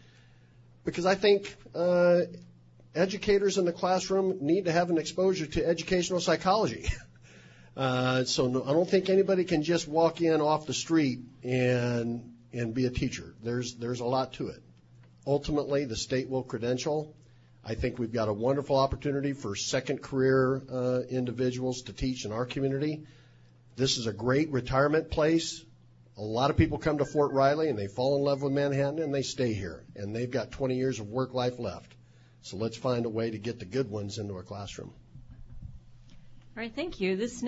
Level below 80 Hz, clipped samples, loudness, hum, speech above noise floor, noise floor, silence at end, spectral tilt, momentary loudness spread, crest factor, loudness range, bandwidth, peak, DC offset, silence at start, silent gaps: -50 dBFS; under 0.1%; -29 LUFS; none; 29 dB; -57 dBFS; 0 s; -5.5 dB/octave; 13 LU; 18 dB; 7 LU; 8 kHz; -12 dBFS; under 0.1%; 0.85 s; none